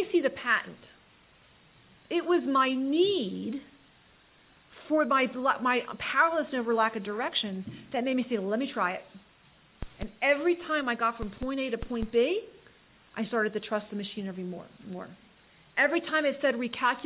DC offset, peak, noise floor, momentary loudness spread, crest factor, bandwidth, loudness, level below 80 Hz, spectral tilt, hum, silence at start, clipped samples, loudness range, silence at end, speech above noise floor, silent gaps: under 0.1%; -10 dBFS; -60 dBFS; 14 LU; 20 dB; 4 kHz; -29 LUFS; -54 dBFS; -2.5 dB/octave; none; 0 s; under 0.1%; 4 LU; 0 s; 32 dB; none